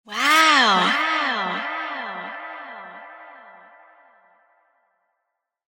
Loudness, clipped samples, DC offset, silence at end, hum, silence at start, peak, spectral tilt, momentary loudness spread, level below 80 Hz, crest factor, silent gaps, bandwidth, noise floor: -18 LUFS; under 0.1%; under 0.1%; 2.15 s; none; 0.05 s; -4 dBFS; -1.5 dB/octave; 24 LU; -78 dBFS; 20 dB; none; 17.5 kHz; -79 dBFS